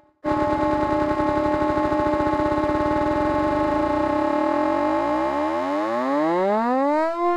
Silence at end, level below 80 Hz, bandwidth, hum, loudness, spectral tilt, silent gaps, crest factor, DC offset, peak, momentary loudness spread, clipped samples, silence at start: 0 s; -42 dBFS; 10.5 kHz; none; -22 LUFS; -7 dB/octave; none; 14 dB; under 0.1%; -8 dBFS; 2 LU; under 0.1%; 0.25 s